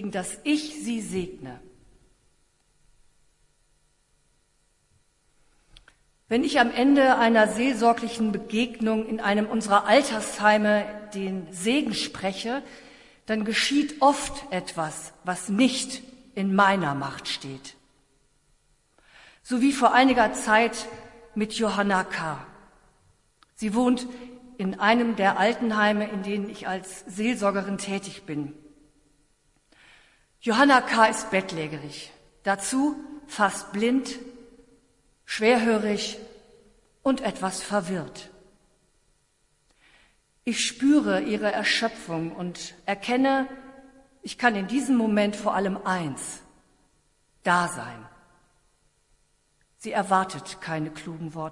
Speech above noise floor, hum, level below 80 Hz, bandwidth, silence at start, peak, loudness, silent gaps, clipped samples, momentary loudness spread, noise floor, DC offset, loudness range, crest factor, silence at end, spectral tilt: 43 dB; none; -58 dBFS; 11.5 kHz; 0 s; -4 dBFS; -25 LUFS; none; under 0.1%; 16 LU; -68 dBFS; under 0.1%; 9 LU; 22 dB; 0 s; -4 dB/octave